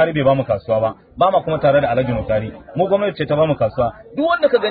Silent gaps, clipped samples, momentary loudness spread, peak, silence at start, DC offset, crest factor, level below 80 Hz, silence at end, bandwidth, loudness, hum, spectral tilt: none; under 0.1%; 7 LU; -4 dBFS; 0 s; under 0.1%; 14 dB; -42 dBFS; 0 s; 4.8 kHz; -18 LUFS; none; -12 dB/octave